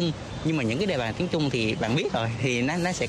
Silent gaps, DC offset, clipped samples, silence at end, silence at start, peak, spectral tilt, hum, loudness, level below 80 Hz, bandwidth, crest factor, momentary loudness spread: none; under 0.1%; under 0.1%; 0 s; 0 s; -12 dBFS; -5.5 dB/octave; none; -26 LUFS; -48 dBFS; 12.5 kHz; 14 dB; 3 LU